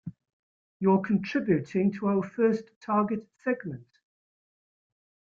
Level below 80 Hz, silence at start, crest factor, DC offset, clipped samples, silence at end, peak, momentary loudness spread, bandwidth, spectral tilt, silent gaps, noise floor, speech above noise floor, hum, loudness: -68 dBFS; 0.05 s; 18 dB; under 0.1%; under 0.1%; 1.5 s; -12 dBFS; 8 LU; 7 kHz; -8.5 dB/octave; 0.33-0.80 s, 2.76-2.81 s; under -90 dBFS; over 63 dB; none; -28 LUFS